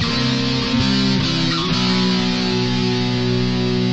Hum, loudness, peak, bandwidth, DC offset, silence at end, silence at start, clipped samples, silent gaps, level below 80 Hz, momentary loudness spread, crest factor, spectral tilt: none; -18 LUFS; -6 dBFS; 8.2 kHz; under 0.1%; 0 s; 0 s; under 0.1%; none; -38 dBFS; 2 LU; 12 dB; -5.5 dB/octave